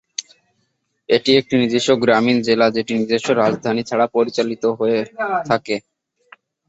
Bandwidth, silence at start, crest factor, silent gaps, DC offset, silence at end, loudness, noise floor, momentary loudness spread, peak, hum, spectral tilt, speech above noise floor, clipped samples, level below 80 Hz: 8.2 kHz; 0.2 s; 18 dB; none; under 0.1%; 0.9 s; -18 LUFS; -69 dBFS; 7 LU; -2 dBFS; none; -4.5 dB/octave; 52 dB; under 0.1%; -60 dBFS